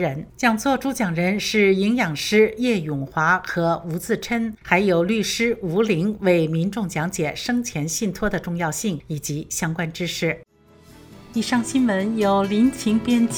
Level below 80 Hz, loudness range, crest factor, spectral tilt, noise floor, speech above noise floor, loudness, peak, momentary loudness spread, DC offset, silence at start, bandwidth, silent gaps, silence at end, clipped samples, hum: -50 dBFS; 5 LU; 20 dB; -5 dB/octave; -50 dBFS; 29 dB; -21 LUFS; -2 dBFS; 8 LU; under 0.1%; 0 s; over 20 kHz; none; 0 s; under 0.1%; none